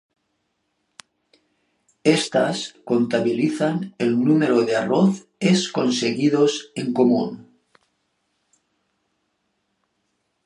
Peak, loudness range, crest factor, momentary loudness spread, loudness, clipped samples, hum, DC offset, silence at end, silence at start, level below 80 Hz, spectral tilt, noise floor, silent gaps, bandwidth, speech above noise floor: -2 dBFS; 7 LU; 20 dB; 6 LU; -20 LUFS; under 0.1%; none; under 0.1%; 3.05 s; 2.05 s; -72 dBFS; -5.5 dB/octave; -73 dBFS; none; 11.5 kHz; 53 dB